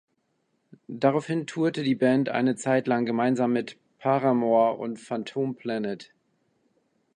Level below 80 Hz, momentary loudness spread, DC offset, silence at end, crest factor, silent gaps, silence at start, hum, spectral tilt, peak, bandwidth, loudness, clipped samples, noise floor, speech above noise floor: -76 dBFS; 10 LU; under 0.1%; 1.1 s; 20 dB; none; 0.9 s; none; -6.5 dB/octave; -8 dBFS; 9.8 kHz; -25 LUFS; under 0.1%; -73 dBFS; 49 dB